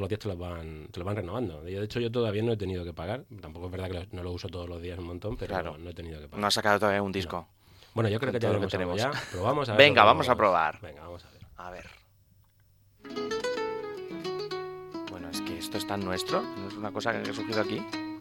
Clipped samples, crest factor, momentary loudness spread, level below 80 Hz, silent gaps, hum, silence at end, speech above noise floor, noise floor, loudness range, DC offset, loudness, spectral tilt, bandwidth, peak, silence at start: under 0.1%; 28 dB; 17 LU; -56 dBFS; none; none; 0 s; 33 dB; -62 dBFS; 13 LU; under 0.1%; -29 LUFS; -5 dB/octave; 17 kHz; -2 dBFS; 0 s